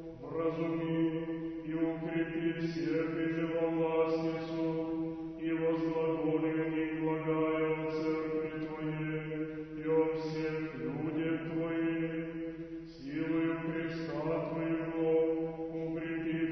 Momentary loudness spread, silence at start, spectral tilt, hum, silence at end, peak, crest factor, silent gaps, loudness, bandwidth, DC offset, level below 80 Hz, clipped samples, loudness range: 7 LU; 0 s; -6.5 dB/octave; none; 0 s; -18 dBFS; 16 dB; none; -34 LUFS; 6.2 kHz; under 0.1%; -62 dBFS; under 0.1%; 3 LU